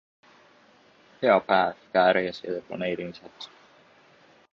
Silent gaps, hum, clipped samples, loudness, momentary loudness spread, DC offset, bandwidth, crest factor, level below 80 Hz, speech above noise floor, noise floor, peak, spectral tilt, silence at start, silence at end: none; none; under 0.1%; -25 LUFS; 21 LU; under 0.1%; 7 kHz; 22 dB; -68 dBFS; 33 dB; -58 dBFS; -6 dBFS; -6 dB/octave; 1.2 s; 1.05 s